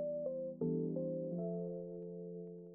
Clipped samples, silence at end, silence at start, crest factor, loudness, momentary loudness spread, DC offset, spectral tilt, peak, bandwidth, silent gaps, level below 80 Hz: under 0.1%; 0 s; 0 s; 14 dB; -42 LUFS; 9 LU; under 0.1%; -8 dB/octave; -28 dBFS; 1.4 kHz; none; -78 dBFS